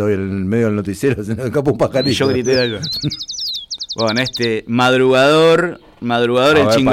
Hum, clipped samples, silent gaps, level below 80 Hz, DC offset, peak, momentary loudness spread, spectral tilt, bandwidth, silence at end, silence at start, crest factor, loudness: none; under 0.1%; none; -46 dBFS; under 0.1%; -4 dBFS; 10 LU; -5 dB/octave; 16 kHz; 0 s; 0 s; 10 dB; -15 LUFS